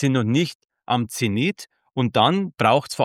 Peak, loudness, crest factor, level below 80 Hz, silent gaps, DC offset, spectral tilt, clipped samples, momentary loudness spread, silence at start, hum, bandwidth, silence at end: -4 dBFS; -21 LUFS; 18 dB; -62 dBFS; 0.55-0.60 s; under 0.1%; -5.5 dB/octave; under 0.1%; 8 LU; 0 s; none; 16 kHz; 0 s